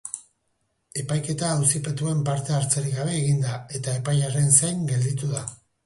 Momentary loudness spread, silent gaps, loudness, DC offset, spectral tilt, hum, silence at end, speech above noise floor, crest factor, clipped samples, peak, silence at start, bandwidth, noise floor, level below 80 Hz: 14 LU; none; -23 LUFS; under 0.1%; -4.5 dB/octave; none; 0.3 s; 49 dB; 22 dB; under 0.1%; -4 dBFS; 0.05 s; 11.5 kHz; -73 dBFS; -58 dBFS